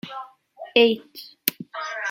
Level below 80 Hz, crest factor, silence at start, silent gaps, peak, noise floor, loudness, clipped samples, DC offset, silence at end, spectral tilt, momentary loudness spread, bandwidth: -72 dBFS; 26 dB; 0.05 s; none; 0 dBFS; -43 dBFS; -23 LUFS; under 0.1%; under 0.1%; 0 s; -3 dB/octave; 24 LU; 16.5 kHz